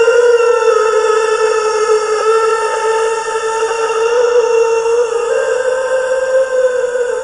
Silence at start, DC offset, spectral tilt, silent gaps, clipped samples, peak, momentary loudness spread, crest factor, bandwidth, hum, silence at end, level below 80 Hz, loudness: 0 s; under 0.1%; -0.5 dB/octave; none; under 0.1%; 0 dBFS; 5 LU; 12 dB; 11 kHz; none; 0 s; -52 dBFS; -13 LUFS